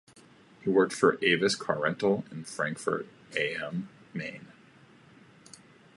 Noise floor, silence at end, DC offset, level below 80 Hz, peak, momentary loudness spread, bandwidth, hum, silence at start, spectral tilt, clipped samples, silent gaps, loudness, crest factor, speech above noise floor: -57 dBFS; 1.5 s; under 0.1%; -72 dBFS; -8 dBFS; 14 LU; 11.5 kHz; none; 0.6 s; -4.5 dB/octave; under 0.1%; none; -29 LUFS; 24 dB; 28 dB